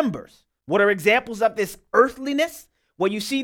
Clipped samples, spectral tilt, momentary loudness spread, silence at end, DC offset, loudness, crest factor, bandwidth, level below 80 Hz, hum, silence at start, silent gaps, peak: under 0.1%; -4.5 dB/octave; 8 LU; 0 s; under 0.1%; -21 LUFS; 20 dB; 18 kHz; -58 dBFS; none; 0 s; none; -2 dBFS